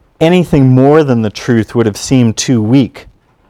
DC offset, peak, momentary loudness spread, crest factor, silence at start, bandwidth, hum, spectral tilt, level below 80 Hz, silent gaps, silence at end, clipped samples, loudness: under 0.1%; 0 dBFS; 6 LU; 10 dB; 0.2 s; 14 kHz; none; -6.5 dB/octave; -38 dBFS; none; 0.5 s; 0.9%; -10 LUFS